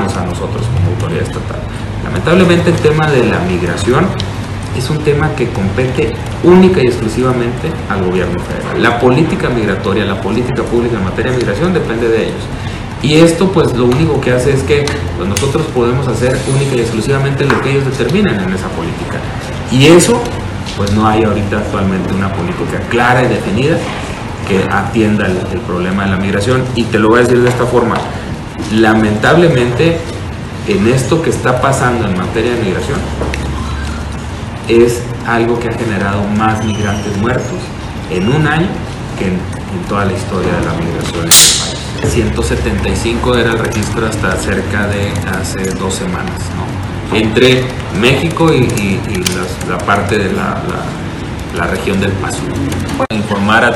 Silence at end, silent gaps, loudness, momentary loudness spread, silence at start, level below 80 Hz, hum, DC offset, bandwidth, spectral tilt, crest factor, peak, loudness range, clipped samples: 0 s; none; -13 LUFS; 11 LU; 0 s; -28 dBFS; none; under 0.1%; over 20 kHz; -5 dB/octave; 12 dB; 0 dBFS; 4 LU; 0.3%